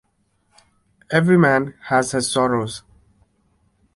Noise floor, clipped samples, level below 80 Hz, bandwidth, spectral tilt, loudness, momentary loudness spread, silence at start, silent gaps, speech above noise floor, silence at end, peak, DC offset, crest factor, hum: -66 dBFS; under 0.1%; -56 dBFS; 12 kHz; -5 dB/octave; -18 LUFS; 10 LU; 1.1 s; none; 48 dB; 1.15 s; -2 dBFS; under 0.1%; 20 dB; none